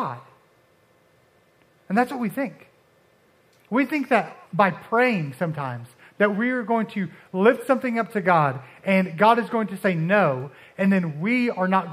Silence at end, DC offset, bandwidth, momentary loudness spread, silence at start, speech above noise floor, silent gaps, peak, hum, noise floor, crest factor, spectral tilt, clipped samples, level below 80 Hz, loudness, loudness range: 0 s; under 0.1%; 15 kHz; 11 LU; 0 s; 38 dB; none; -2 dBFS; none; -60 dBFS; 20 dB; -7.5 dB/octave; under 0.1%; -74 dBFS; -23 LUFS; 7 LU